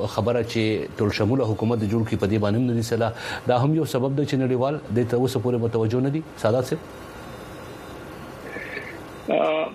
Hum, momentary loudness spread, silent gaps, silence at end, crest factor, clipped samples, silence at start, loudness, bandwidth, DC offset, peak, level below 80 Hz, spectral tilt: none; 16 LU; none; 0 s; 18 dB; under 0.1%; 0 s; -24 LUFS; 15 kHz; under 0.1%; -6 dBFS; -52 dBFS; -7 dB/octave